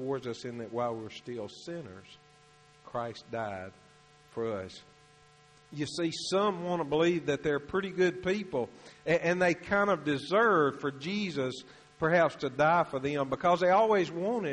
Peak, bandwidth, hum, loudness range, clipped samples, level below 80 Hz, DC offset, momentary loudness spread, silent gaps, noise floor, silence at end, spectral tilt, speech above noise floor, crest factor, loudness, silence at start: -14 dBFS; 10.5 kHz; none; 12 LU; under 0.1%; -64 dBFS; under 0.1%; 15 LU; none; -60 dBFS; 0 s; -5.5 dB/octave; 30 dB; 18 dB; -30 LUFS; 0 s